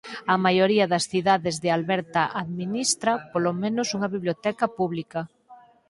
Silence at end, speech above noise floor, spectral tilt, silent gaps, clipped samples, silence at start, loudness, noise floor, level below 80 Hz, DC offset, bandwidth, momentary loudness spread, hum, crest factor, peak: 0.35 s; 28 dB; -4 dB/octave; none; under 0.1%; 0.05 s; -24 LUFS; -52 dBFS; -66 dBFS; under 0.1%; 11.5 kHz; 9 LU; none; 20 dB; -4 dBFS